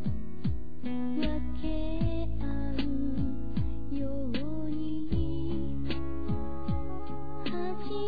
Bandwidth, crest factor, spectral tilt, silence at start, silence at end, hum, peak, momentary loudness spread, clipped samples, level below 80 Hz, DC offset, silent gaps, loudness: 5 kHz; 16 dB; -10 dB/octave; 0 s; 0 s; none; -14 dBFS; 4 LU; under 0.1%; -40 dBFS; 4%; none; -35 LUFS